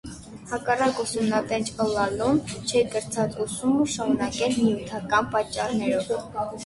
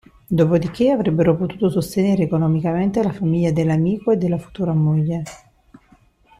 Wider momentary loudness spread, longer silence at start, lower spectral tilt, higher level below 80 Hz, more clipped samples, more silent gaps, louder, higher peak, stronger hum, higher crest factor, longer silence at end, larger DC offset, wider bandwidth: about the same, 6 LU vs 6 LU; second, 0.05 s vs 0.3 s; second, -4.5 dB/octave vs -8.5 dB/octave; about the same, -52 dBFS vs -48 dBFS; neither; neither; second, -25 LUFS vs -19 LUFS; second, -8 dBFS vs -4 dBFS; neither; about the same, 18 dB vs 16 dB; second, 0 s vs 1 s; neither; second, 11.5 kHz vs 13.5 kHz